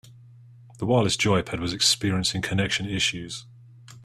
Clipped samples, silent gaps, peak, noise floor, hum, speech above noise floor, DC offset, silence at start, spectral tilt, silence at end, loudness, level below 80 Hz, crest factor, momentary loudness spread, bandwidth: under 0.1%; none; -8 dBFS; -49 dBFS; none; 25 dB; under 0.1%; 0.05 s; -3.5 dB/octave; 0 s; -24 LUFS; -52 dBFS; 18 dB; 12 LU; 14 kHz